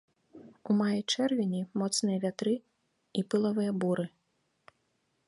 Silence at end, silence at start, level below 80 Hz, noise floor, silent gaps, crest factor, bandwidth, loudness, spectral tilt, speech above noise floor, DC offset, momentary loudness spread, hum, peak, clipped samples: 1.2 s; 0.35 s; -78 dBFS; -76 dBFS; none; 16 dB; 11.5 kHz; -31 LUFS; -5 dB/octave; 47 dB; under 0.1%; 7 LU; none; -16 dBFS; under 0.1%